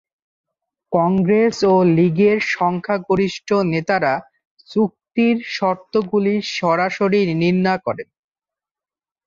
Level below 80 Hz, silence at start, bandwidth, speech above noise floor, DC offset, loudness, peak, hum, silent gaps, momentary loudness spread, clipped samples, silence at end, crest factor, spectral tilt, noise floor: -56 dBFS; 0.9 s; 7.6 kHz; over 73 dB; under 0.1%; -18 LUFS; -4 dBFS; none; 4.45-4.57 s; 7 LU; under 0.1%; 1.25 s; 14 dB; -6.5 dB/octave; under -90 dBFS